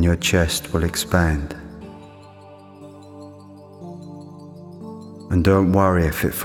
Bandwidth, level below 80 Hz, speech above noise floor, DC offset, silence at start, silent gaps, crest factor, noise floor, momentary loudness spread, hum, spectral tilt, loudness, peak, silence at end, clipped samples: 19.5 kHz; -38 dBFS; 25 dB; under 0.1%; 0 s; none; 20 dB; -43 dBFS; 24 LU; none; -5.5 dB/octave; -19 LUFS; -2 dBFS; 0 s; under 0.1%